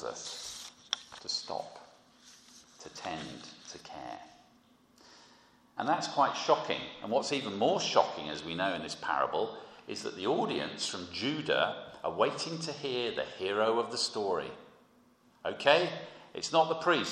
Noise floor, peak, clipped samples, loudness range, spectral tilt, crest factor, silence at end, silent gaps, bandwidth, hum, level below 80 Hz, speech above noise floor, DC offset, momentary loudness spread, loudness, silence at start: -64 dBFS; -8 dBFS; under 0.1%; 13 LU; -3 dB/octave; 26 dB; 0 s; none; 13.5 kHz; none; -72 dBFS; 32 dB; under 0.1%; 17 LU; -32 LUFS; 0 s